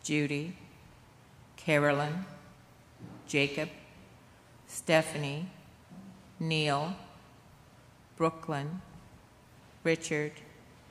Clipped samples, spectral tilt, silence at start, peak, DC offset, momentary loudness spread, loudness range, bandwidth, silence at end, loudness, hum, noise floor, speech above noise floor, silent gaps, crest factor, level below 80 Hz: under 0.1%; -5 dB/octave; 0.05 s; -10 dBFS; under 0.1%; 25 LU; 3 LU; 15 kHz; 0.4 s; -32 LUFS; none; -58 dBFS; 27 dB; none; 24 dB; -66 dBFS